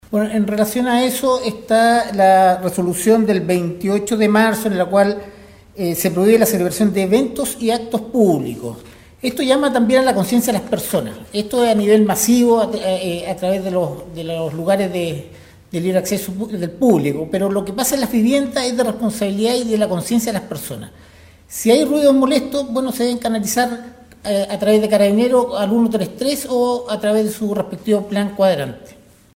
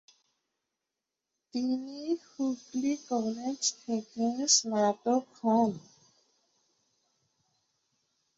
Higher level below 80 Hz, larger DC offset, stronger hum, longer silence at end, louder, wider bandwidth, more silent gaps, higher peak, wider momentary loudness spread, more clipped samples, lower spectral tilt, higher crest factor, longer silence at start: first, -50 dBFS vs -80 dBFS; neither; neither; second, 0.4 s vs 2.6 s; first, -17 LUFS vs -30 LUFS; first, 16.5 kHz vs 8 kHz; neither; first, -2 dBFS vs -8 dBFS; about the same, 11 LU vs 11 LU; neither; first, -5 dB/octave vs -3 dB/octave; second, 16 dB vs 24 dB; second, 0.1 s vs 1.55 s